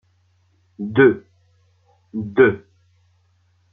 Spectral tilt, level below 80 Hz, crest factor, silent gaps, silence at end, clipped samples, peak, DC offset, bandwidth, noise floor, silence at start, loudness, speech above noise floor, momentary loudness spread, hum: -9.5 dB/octave; -62 dBFS; 20 dB; none; 1.15 s; under 0.1%; -2 dBFS; under 0.1%; 3.7 kHz; -61 dBFS; 0.8 s; -18 LUFS; 45 dB; 17 LU; none